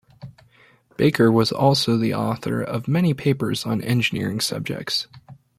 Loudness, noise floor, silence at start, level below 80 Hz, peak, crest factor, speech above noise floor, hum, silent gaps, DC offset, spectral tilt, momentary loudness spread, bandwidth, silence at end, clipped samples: -21 LUFS; -55 dBFS; 0.2 s; -56 dBFS; -4 dBFS; 18 dB; 35 dB; none; none; under 0.1%; -5.5 dB/octave; 8 LU; 16 kHz; 0.25 s; under 0.1%